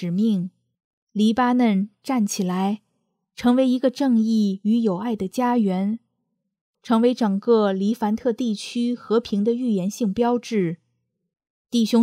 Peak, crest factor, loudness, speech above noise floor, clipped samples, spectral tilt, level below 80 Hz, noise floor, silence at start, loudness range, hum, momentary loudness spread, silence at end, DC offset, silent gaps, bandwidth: -6 dBFS; 16 dB; -22 LUFS; 56 dB; under 0.1%; -6.5 dB/octave; -62 dBFS; -76 dBFS; 0 s; 2 LU; none; 7 LU; 0 s; under 0.1%; 0.84-1.07 s, 6.61-6.74 s, 11.50-11.65 s; 15 kHz